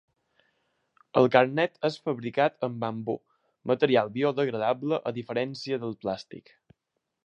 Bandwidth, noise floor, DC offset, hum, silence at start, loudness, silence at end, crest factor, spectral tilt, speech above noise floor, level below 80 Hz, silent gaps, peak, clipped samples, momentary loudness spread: 8.6 kHz; -82 dBFS; under 0.1%; none; 1.15 s; -27 LUFS; 0.85 s; 24 dB; -7 dB/octave; 55 dB; -72 dBFS; none; -4 dBFS; under 0.1%; 12 LU